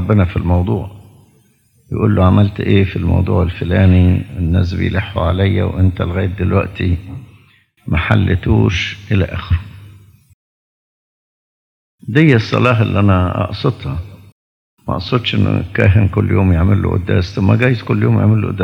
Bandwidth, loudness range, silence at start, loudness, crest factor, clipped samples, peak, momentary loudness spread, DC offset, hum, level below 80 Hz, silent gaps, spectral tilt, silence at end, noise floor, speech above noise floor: 6.4 kHz; 4 LU; 0 s; -15 LUFS; 14 dB; under 0.1%; 0 dBFS; 10 LU; under 0.1%; none; -36 dBFS; 10.34-11.98 s, 14.32-14.77 s; -8.5 dB/octave; 0 s; -54 dBFS; 41 dB